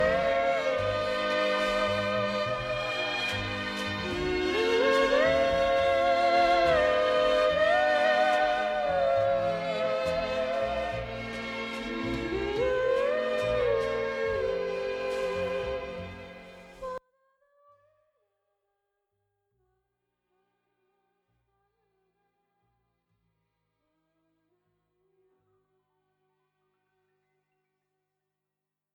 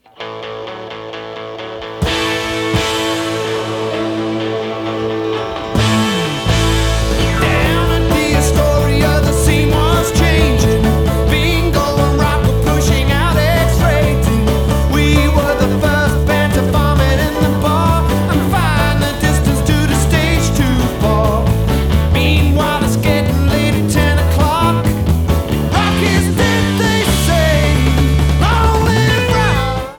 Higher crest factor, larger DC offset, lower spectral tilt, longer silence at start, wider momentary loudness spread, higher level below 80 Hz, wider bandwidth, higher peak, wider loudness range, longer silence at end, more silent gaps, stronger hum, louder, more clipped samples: first, 18 dB vs 12 dB; neither; about the same, -4.5 dB/octave vs -5.5 dB/octave; second, 0 s vs 0.2 s; first, 11 LU vs 6 LU; second, -52 dBFS vs -18 dBFS; second, 12.5 kHz vs 19.5 kHz; second, -12 dBFS vs -2 dBFS; first, 11 LU vs 5 LU; first, 11.95 s vs 0 s; neither; neither; second, -27 LUFS vs -14 LUFS; neither